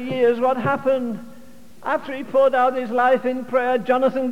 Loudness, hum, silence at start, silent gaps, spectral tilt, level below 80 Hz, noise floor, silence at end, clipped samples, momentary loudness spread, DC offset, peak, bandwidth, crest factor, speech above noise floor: -20 LUFS; none; 0 s; none; -6.5 dB/octave; -64 dBFS; -46 dBFS; 0 s; under 0.1%; 8 LU; 1%; -6 dBFS; 11.5 kHz; 14 dB; 27 dB